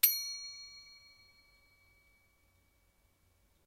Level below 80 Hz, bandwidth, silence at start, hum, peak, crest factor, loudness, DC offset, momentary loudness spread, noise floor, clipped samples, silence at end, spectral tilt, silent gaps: -76 dBFS; 16 kHz; 0.05 s; none; -10 dBFS; 32 dB; -35 LUFS; under 0.1%; 25 LU; -72 dBFS; under 0.1%; 2.7 s; 3.5 dB/octave; none